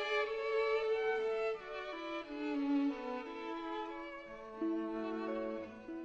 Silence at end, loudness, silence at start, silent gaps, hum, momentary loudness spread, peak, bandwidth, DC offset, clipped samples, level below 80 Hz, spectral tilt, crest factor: 0 s; -38 LUFS; 0 s; none; none; 11 LU; -24 dBFS; 7.8 kHz; under 0.1%; under 0.1%; -68 dBFS; -5 dB/octave; 14 dB